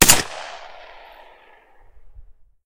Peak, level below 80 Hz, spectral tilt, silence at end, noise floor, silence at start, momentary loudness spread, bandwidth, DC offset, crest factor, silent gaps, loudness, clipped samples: 0 dBFS; -40 dBFS; -1 dB/octave; 0.45 s; -50 dBFS; 0 s; 28 LU; 16 kHz; under 0.1%; 22 dB; none; -17 LUFS; under 0.1%